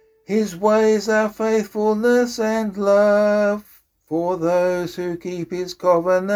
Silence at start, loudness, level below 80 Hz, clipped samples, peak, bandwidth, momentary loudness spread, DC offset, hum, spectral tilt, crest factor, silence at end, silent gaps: 0.3 s; -19 LUFS; -58 dBFS; under 0.1%; -4 dBFS; 19.5 kHz; 11 LU; under 0.1%; none; -5.5 dB/octave; 14 dB; 0 s; none